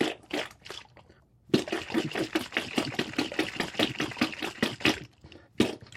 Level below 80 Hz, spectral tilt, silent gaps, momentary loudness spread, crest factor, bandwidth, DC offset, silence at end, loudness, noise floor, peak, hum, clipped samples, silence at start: -60 dBFS; -4 dB/octave; none; 9 LU; 24 dB; 16 kHz; under 0.1%; 0 s; -30 LUFS; -59 dBFS; -8 dBFS; none; under 0.1%; 0 s